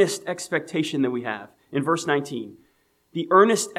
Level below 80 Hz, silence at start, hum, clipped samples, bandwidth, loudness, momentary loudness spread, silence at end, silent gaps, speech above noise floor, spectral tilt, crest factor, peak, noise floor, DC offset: -74 dBFS; 0 s; none; under 0.1%; 15 kHz; -23 LUFS; 17 LU; 0 s; none; 42 dB; -4.5 dB/octave; 20 dB; -4 dBFS; -65 dBFS; under 0.1%